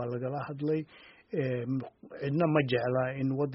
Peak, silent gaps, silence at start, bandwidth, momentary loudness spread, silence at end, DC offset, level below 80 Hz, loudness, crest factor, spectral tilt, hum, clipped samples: -12 dBFS; none; 0 s; 5.8 kHz; 11 LU; 0 s; under 0.1%; -66 dBFS; -31 LUFS; 20 dB; -6.5 dB/octave; none; under 0.1%